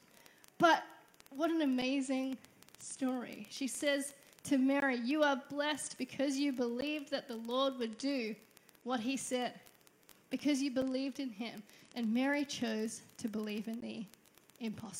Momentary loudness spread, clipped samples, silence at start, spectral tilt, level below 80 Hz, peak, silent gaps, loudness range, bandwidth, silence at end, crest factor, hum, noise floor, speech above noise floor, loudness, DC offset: 14 LU; under 0.1%; 0.6 s; -3.5 dB/octave; -80 dBFS; -16 dBFS; none; 4 LU; 16 kHz; 0 s; 22 dB; none; -64 dBFS; 29 dB; -36 LUFS; under 0.1%